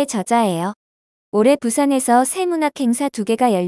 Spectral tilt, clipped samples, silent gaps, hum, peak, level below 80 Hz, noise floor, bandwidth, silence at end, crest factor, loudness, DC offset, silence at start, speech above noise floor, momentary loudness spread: -4.5 dB/octave; under 0.1%; 0.76-1.32 s; none; -2 dBFS; -68 dBFS; under -90 dBFS; 12 kHz; 0 s; 16 dB; -18 LUFS; under 0.1%; 0 s; over 73 dB; 6 LU